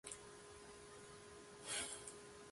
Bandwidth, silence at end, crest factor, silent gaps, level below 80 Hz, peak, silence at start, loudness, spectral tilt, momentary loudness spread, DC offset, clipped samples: 12 kHz; 0 s; 22 dB; none; -74 dBFS; -32 dBFS; 0.05 s; -51 LUFS; -1 dB/octave; 13 LU; under 0.1%; under 0.1%